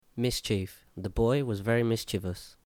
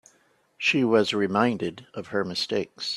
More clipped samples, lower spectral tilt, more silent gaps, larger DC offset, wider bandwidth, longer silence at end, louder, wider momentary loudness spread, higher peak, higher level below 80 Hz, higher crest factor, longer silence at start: neither; about the same, -5.5 dB/octave vs -5 dB/octave; neither; neither; first, 18 kHz vs 12.5 kHz; first, 0.15 s vs 0 s; second, -30 LUFS vs -25 LUFS; about the same, 11 LU vs 10 LU; second, -16 dBFS vs -6 dBFS; first, -46 dBFS vs -66 dBFS; second, 14 dB vs 20 dB; second, 0.15 s vs 0.6 s